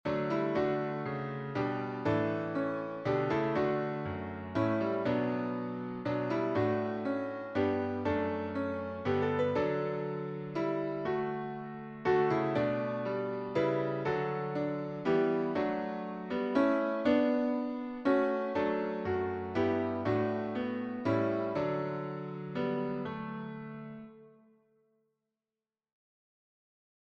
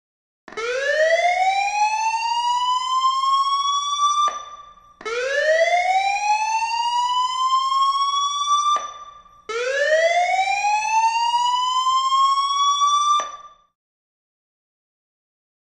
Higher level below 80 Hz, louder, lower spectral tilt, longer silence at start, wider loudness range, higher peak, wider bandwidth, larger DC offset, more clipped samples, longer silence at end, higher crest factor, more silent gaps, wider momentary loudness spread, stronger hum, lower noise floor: about the same, -66 dBFS vs -62 dBFS; second, -33 LUFS vs -19 LUFS; first, -8.5 dB/octave vs 2 dB/octave; second, 0.05 s vs 0.5 s; first, 5 LU vs 2 LU; second, -16 dBFS vs -8 dBFS; second, 7 kHz vs 11.5 kHz; neither; neither; first, 2.75 s vs 2.3 s; first, 18 dB vs 12 dB; neither; about the same, 8 LU vs 7 LU; neither; first, under -90 dBFS vs -44 dBFS